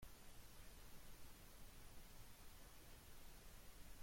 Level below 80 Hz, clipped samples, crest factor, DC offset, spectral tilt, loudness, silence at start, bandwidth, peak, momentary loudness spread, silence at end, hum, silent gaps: -64 dBFS; under 0.1%; 14 dB; under 0.1%; -3 dB/octave; -63 LUFS; 0 s; 16.5 kHz; -44 dBFS; 0 LU; 0 s; none; none